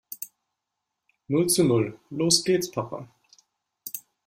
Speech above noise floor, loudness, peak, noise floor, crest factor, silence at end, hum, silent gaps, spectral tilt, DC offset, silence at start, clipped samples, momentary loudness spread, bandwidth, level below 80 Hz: 60 dB; -23 LUFS; -6 dBFS; -83 dBFS; 22 dB; 0.25 s; none; none; -4 dB/octave; under 0.1%; 0.1 s; under 0.1%; 18 LU; 16 kHz; -64 dBFS